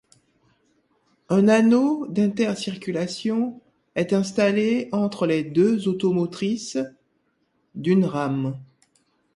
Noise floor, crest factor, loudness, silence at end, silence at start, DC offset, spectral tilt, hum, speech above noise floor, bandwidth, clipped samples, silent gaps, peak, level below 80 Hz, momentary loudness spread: -69 dBFS; 16 dB; -22 LUFS; 0.7 s; 1.3 s; under 0.1%; -6.5 dB/octave; none; 48 dB; 11.5 kHz; under 0.1%; none; -6 dBFS; -66 dBFS; 12 LU